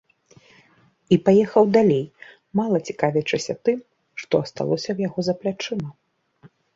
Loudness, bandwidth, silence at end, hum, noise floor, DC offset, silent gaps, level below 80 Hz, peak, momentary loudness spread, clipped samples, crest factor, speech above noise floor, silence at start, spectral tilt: -22 LUFS; 7.8 kHz; 0.3 s; none; -58 dBFS; under 0.1%; none; -62 dBFS; -2 dBFS; 13 LU; under 0.1%; 20 dB; 37 dB; 1.1 s; -6.5 dB/octave